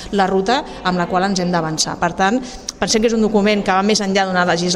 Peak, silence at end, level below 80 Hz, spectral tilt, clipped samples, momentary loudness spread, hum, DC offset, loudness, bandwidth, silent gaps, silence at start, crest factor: -4 dBFS; 0 s; -42 dBFS; -4 dB/octave; under 0.1%; 4 LU; none; under 0.1%; -17 LUFS; 12.5 kHz; none; 0 s; 14 dB